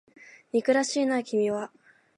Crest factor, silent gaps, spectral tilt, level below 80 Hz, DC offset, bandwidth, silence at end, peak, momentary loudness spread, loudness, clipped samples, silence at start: 18 dB; none; -4 dB/octave; -80 dBFS; under 0.1%; 11.5 kHz; 0.5 s; -10 dBFS; 8 LU; -26 LUFS; under 0.1%; 0.55 s